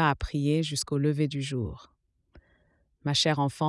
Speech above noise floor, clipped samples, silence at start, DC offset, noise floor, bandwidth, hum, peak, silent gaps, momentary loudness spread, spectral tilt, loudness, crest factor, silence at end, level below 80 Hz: 40 dB; under 0.1%; 0 s; under 0.1%; -68 dBFS; 12 kHz; none; -10 dBFS; none; 11 LU; -5 dB/octave; -28 LUFS; 20 dB; 0 s; -48 dBFS